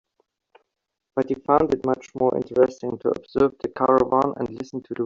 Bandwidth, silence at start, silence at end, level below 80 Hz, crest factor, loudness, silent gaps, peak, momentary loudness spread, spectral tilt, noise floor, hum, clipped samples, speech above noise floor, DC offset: 7.4 kHz; 1.15 s; 0 s; -56 dBFS; 20 dB; -23 LUFS; none; -4 dBFS; 11 LU; -7.5 dB/octave; -71 dBFS; none; under 0.1%; 49 dB; under 0.1%